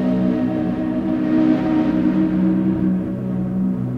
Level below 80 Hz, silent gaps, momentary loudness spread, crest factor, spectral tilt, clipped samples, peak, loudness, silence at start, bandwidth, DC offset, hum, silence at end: -44 dBFS; none; 5 LU; 14 dB; -10 dB/octave; under 0.1%; -6 dBFS; -19 LUFS; 0 s; 5.4 kHz; under 0.1%; none; 0 s